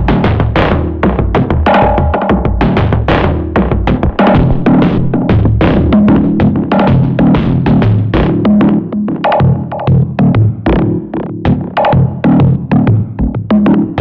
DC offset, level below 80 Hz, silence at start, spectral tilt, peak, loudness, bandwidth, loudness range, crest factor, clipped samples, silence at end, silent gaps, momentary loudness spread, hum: under 0.1%; -20 dBFS; 0 s; -10 dB/octave; -2 dBFS; -11 LUFS; 5.6 kHz; 2 LU; 8 dB; under 0.1%; 0 s; none; 4 LU; none